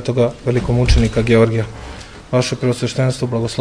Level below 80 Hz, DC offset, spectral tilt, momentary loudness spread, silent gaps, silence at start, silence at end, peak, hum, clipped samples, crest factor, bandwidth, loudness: -26 dBFS; 0.1%; -6.5 dB/octave; 13 LU; none; 0 s; 0 s; 0 dBFS; none; under 0.1%; 16 dB; 11 kHz; -17 LUFS